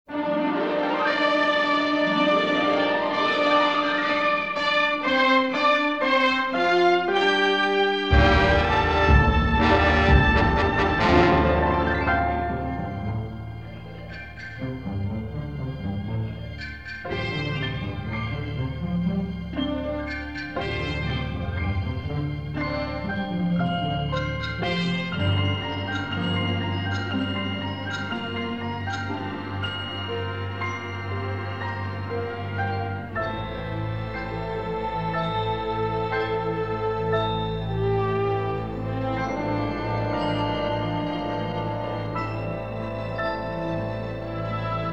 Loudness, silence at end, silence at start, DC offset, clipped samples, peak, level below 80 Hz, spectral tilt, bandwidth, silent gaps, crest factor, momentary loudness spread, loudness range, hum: -24 LUFS; 0 s; 0.05 s; 0.3%; under 0.1%; -4 dBFS; -34 dBFS; -6.5 dB/octave; 8.4 kHz; none; 20 dB; 12 LU; 10 LU; none